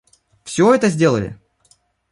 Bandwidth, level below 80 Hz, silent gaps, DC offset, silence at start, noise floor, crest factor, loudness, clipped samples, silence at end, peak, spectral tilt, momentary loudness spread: 11.5 kHz; -52 dBFS; none; under 0.1%; 0.45 s; -58 dBFS; 18 dB; -16 LUFS; under 0.1%; 0.8 s; -2 dBFS; -6 dB/octave; 13 LU